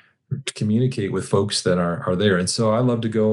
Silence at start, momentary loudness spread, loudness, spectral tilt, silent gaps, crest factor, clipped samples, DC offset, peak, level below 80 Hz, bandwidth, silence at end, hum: 0.3 s; 7 LU; -21 LUFS; -5.5 dB/octave; none; 14 dB; under 0.1%; under 0.1%; -6 dBFS; -62 dBFS; 12 kHz; 0 s; none